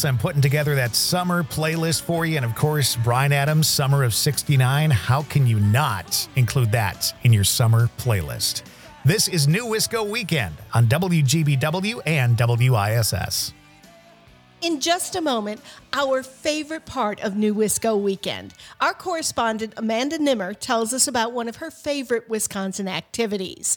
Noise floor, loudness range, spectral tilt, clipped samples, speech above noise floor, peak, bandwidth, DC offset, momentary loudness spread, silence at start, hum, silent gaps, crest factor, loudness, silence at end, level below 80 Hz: -51 dBFS; 4 LU; -4.5 dB/octave; under 0.1%; 30 dB; -4 dBFS; 19 kHz; under 0.1%; 8 LU; 0 s; none; none; 18 dB; -21 LUFS; 0 s; -52 dBFS